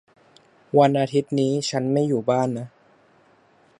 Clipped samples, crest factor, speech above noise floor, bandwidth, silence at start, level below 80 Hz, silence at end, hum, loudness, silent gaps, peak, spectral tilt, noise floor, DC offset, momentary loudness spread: under 0.1%; 20 dB; 37 dB; 11 kHz; 0.75 s; -70 dBFS; 1.15 s; none; -22 LUFS; none; -4 dBFS; -6.5 dB/octave; -58 dBFS; under 0.1%; 8 LU